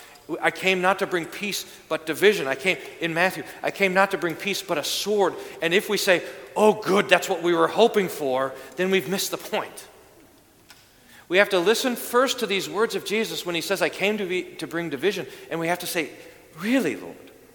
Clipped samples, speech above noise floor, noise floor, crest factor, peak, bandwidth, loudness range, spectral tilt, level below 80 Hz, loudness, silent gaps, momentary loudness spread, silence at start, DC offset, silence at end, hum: under 0.1%; 30 dB; -54 dBFS; 24 dB; 0 dBFS; 19 kHz; 5 LU; -3.5 dB/octave; -66 dBFS; -23 LUFS; none; 10 LU; 0 s; under 0.1%; 0.25 s; none